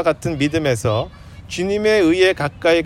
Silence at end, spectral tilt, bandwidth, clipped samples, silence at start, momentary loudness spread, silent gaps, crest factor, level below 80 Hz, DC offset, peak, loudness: 0 s; -5.5 dB/octave; 15 kHz; under 0.1%; 0 s; 10 LU; none; 16 dB; -44 dBFS; under 0.1%; -2 dBFS; -18 LUFS